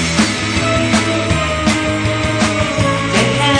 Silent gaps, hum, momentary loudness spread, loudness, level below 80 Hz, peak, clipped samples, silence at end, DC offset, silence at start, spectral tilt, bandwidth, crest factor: none; none; 2 LU; -15 LUFS; -30 dBFS; 0 dBFS; under 0.1%; 0 s; under 0.1%; 0 s; -4.5 dB/octave; 10.5 kHz; 14 dB